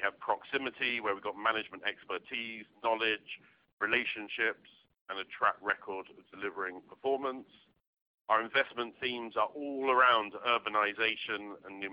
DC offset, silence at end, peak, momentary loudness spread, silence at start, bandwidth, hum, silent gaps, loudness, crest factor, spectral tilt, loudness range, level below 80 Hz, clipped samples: under 0.1%; 0 s; -12 dBFS; 13 LU; 0 s; 5.4 kHz; none; 3.73-3.78 s, 5.01-5.06 s, 7.87-7.93 s, 8.02-8.25 s; -33 LUFS; 22 dB; -6.5 dB/octave; 6 LU; -78 dBFS; under 0.1%